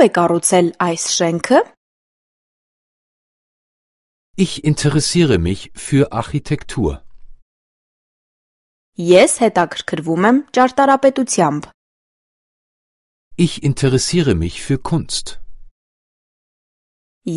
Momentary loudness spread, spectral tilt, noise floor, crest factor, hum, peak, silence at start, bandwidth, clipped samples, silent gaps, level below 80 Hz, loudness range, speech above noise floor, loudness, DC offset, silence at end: 11 LU; -5 dB/octave; under -90 dBFS; 18 dB; none; 0 dBFS; 0 s; 12 kHz; under 0.1%; 1.77-4.34 s, 7.42-8.93 s, 11.74-13.31 s, 15.71-17.21 s; -38 dBFS; 8 LU; over 75 dB; -16 LUFS; under 0.1%; 0 s